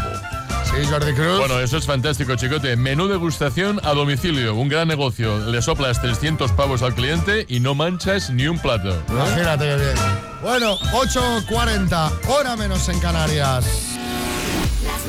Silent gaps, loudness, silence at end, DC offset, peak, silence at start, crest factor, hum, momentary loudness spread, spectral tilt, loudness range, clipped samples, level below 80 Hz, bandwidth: none; -20 LUFS; 0 s; under 0.1%; -8 dBFS; 0 s; 12 dB; none; 4 LU; -5 dB/octave; 1 LU; under 0.1%; -30 dBFS; 17 kHz